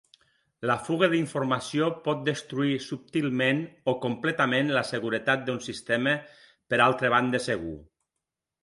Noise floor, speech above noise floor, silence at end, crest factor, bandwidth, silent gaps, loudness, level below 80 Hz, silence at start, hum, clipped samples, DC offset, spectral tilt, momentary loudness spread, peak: -86 dBFS; 59 dB; 0.8 s; 22 dB; 11.5 kHz; none; -27 LUFS; -62 dBFS; 0.6 s; none; under 0.1%; under 0.1%; -5.5 dB/octave; 8 LU; -6 dBFS